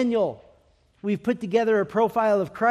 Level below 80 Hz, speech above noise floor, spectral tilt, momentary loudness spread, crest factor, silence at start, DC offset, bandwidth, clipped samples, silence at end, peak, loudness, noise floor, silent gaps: -62 dBFS; 38 dB; -7 dB/octave; 7 LU; 14 dB; 0 s; under 0.1%; 14 kHz; under 0.1%; 0 s; -8 dBFS; -24 LUFS; -61 dBFS; none